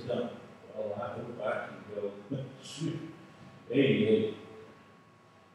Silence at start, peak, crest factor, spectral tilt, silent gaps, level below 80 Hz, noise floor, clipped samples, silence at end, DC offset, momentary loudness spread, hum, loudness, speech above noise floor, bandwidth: 0 s; -14 dBFS; 20 dB; -6.5 dB/octave; none; -78 dBFS; -59 dBFS; under 0.1%; 0.65 s; under 0.1%; 24 LU; none; -33 LUFS; 27 dB; 11 kHz